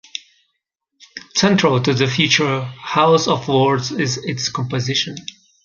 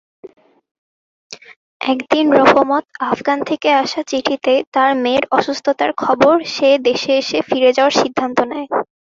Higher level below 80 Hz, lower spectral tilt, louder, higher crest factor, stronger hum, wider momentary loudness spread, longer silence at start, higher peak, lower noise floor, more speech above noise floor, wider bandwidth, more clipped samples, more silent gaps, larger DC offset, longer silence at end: about the same, -56 dBFS vs -58 dBFS; about the same, -4.5 dB/octave vs -4 dB/octave; about the same, -17 LUFS vs -15 LUFS; about the same, 18 dB vs 16 dB; neither; first, 18 LU vs 8 LU; about the same, 0.15 s vs 0.25 s; about the same, -2 dBFS vs 0 dBFS; second, -75 dBFS vs under -90 dBFS; second, 57 dB vs over 75 dB; about the same, 7.4 kHz vs 7.6 kHz; neither; second, none vs 0.71-1.30 s, 1.56-1.80 s, 4.67-4.72 s; neither; first, 0.35 s vs 0.2 s